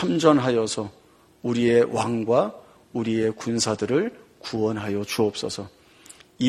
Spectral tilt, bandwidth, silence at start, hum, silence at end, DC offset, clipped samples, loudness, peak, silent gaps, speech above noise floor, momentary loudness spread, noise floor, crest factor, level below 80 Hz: -5 dB/octave; 14 kHz; 0 s; none; 0 s; under 0.1%; under 0.1%; -24 LUFS; -2 dBFS; none; 27 dB; 14 LU; -50 dBFS; 22 dB; -62 dBFS